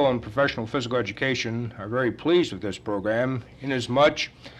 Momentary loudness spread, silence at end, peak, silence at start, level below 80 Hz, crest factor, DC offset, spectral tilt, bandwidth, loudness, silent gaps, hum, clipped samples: 9 LU; 0 s; -8 dBFS; 0 s; -54 dBFS; 16 dB; under 0.1%; -5.5 dB/octave; 10 kHz; -25 LUFS; none; none; under 0.1%